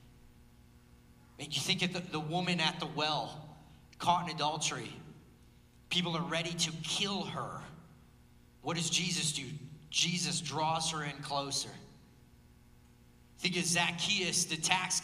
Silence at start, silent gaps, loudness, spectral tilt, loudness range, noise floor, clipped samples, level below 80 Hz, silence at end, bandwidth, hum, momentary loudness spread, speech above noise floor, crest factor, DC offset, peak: 0 s; none; -33 LUFS; -2.5 dB/octave; 3 LU; -60 dBFS; under 0.1%; -64 dBFS; 0 s; 15.5 kHz; 60 Hz at -65 dBFS; 14 LU; 26 dB; 26 dB; under 0.1%; -10 dBFS